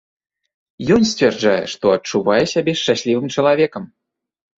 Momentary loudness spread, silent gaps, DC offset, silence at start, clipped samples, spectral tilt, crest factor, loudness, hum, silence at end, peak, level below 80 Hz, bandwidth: 4 LU; none; under 0.1%; 0.8 s; under 0.1%; -4.5 dB/octave; 16 dB; -17 LUFS; none; 0.75 s; -2 dBFS; -52 dBFS; 8 kHz